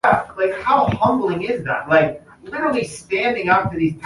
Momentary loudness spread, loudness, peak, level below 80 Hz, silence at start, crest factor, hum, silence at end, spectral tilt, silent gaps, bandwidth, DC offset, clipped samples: 7 LU; -19 LUFS; -2 dBFS; -46 dBFS; 0.05 s; 16 dB; none; 0 s; -6 dB/octave; none; 11.5 kHz; under 0.1%; under 0.1%